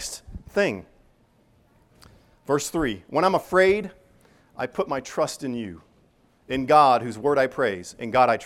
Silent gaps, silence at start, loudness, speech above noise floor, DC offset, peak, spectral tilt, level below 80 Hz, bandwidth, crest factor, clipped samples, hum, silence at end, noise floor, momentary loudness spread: none; 0 s; -23 LUFS; 38 dB; under 0.1%; -4 dBFS; -4.5 dB/octave; -52 dBFS; 16 kHz; 20 dB; under 0.1%; none; 0 s; -61 dBFS; 14 LU